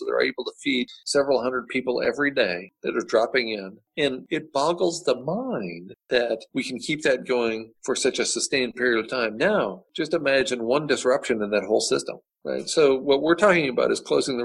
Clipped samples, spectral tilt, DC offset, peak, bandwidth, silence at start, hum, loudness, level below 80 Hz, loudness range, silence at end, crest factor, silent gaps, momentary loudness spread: under 0.1%; -3.5 dB/octave; under 0.1%; -6 dBFS; 12 kHz; 0 s; none; -24 LUFS; -62 dBFS; 4 LU; 0 s; 18 dB; none; 9 LU